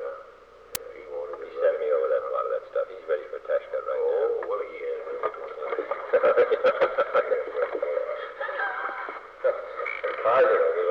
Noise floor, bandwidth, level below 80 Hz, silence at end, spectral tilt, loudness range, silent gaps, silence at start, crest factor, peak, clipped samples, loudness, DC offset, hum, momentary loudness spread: -50 dBFS; 19.5 kHz; -66 dBFS; 0 s; -3 dB/octave; 4 LU; none; 0 s; 26 dB; 0 dBFS; under 0.1%; -27 LUFS; under 0.1%; none; 14 LU